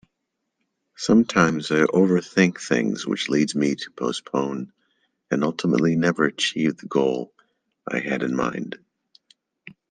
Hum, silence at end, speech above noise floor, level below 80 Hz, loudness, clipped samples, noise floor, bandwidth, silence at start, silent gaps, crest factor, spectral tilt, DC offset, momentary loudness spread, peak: none; 0.2 s; 57 dB; -60 dBFS; -22 LUFS; under 0.1%; -79 dBFS; 9.6 kHz; 1 s; none; 20 dB; -5.5 dB/octave; under 0.1%; 11 LU; -2 dBFS